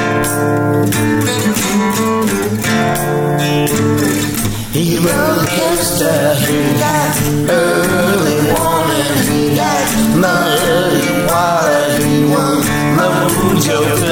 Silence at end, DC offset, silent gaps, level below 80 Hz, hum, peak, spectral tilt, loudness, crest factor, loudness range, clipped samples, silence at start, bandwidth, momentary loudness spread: 0 s; under 0.1%; none; -34 dBFS; none; 0 dBFS; -4.5 dB/octave; -13 LUFS; 12 dB; 2 LU; under 0.1%; 0 s; 19 kHz; 2 LU